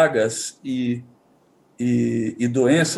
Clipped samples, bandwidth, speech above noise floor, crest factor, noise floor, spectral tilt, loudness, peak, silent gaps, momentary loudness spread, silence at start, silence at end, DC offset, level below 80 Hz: under 0.1%; 12.5 kHz; 37 dB; 16 dB; -58 dBFS; -5 dB/octave; -22 LUFS; -4 dBFS; none; 9 LU; 0 s; 0 s; under 0.1%; -68 dBFS